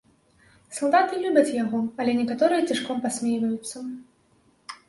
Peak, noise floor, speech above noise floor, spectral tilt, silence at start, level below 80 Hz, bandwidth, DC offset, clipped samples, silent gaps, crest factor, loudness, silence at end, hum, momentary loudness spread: -6 dBFS; -62 dBFS; 39 dB; -4 dB/octave; 0.7 s; -68 dBFS; 11.5 kHz; under 0.1%; under 0.1%; none; 20 dB; -24 LUFS; 0.15 s; none; 15 LU